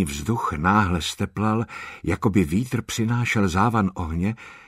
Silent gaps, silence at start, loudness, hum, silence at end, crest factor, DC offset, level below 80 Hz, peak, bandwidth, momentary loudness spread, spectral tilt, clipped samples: none; 0 s; -23 LUFS; none; 0.1 s; 18 dB; under 0.1%; -42 dBFS; -4 dBFS; 16 kHz; 7 LU; -6 dB/octave; under 0.1%